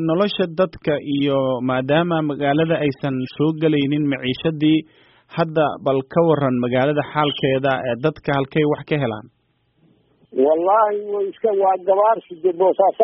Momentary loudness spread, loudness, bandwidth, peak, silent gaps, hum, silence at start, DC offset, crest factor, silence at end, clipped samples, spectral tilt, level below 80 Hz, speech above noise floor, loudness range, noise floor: 6 LU; -19 LUFS; 5.8 kHz; -2 dBFS; none; none; 0 s; under 0.1%; 16 dB; 0 s; under 0.1%; -5 dB/octave; -56 dBFS; 43 dB; 2 LU; -62 dBFS